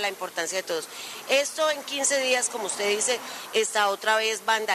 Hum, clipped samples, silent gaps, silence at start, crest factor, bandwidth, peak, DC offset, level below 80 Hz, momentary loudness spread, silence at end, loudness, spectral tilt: none; under 0.1%; none; 0 s; 18 dB; 14 kHz; -8 dBFS; under 0.1%; -82 dBFS; 8 LU; 0 s; -25 LUFS; 0.5 dB/octave